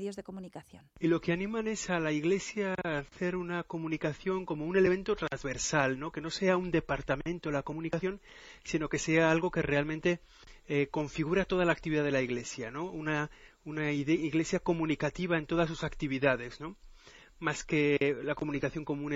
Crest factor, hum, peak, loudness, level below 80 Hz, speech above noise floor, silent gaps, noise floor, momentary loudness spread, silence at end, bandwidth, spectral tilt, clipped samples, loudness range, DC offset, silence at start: 22 dB; none; -10 dBFS; -32 LUFS; -54 dBFS; 24 dB; none; -56 dBFS; 10 LU; 0 s; 8.4 kHz; -5.5 dB/octave; under 0.1%; 2 LU; under 0.1%; 0 s